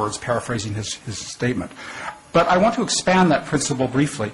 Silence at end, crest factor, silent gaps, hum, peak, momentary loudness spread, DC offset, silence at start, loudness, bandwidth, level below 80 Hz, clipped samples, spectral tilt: 0 s; 14 dB; none; none; -8 dBFS; 14 LU; under 0.1%; 0 s; -20 LUFS; 11.5 kHz; -48 dBFS; under 0.1%; -4.5 dB/octave